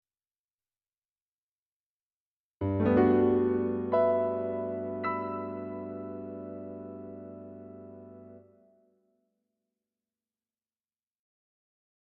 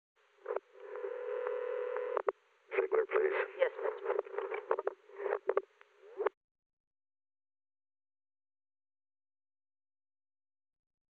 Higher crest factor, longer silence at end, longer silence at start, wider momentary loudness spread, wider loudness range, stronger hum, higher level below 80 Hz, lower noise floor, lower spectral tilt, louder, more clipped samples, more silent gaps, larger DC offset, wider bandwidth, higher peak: about the same, 22 dB vs 26 dB; second, 3.65 s vs 4.85 s; first, 2.6 s vs 0.45 s; first, 23 LU vs 10 LU; first, 19 LU vs 12 LU; neither; first, -66 dBFS vs under -90 dBFS; first, under -90 dBFS vs -61 dBFS; first, -8 dB/octave vs 0 dB/octave; first, -29 LUFS vs -37 LUFS; neither; neither; neither; about the same, 4.3 kHz vs 4.4 kHz; about the same, -12 dBFS vs -12 dBFS